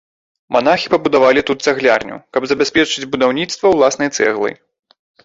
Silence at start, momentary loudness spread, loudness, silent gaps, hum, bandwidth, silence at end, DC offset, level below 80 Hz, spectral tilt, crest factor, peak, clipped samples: 0.5 s; 7 LU; -15 LUFS; none; none; 8 kHz; 0.7 s; under 0.1%; -52 dBFS; -3.5 dB/octave; 14 dB; -2 dBFS; under 0.1%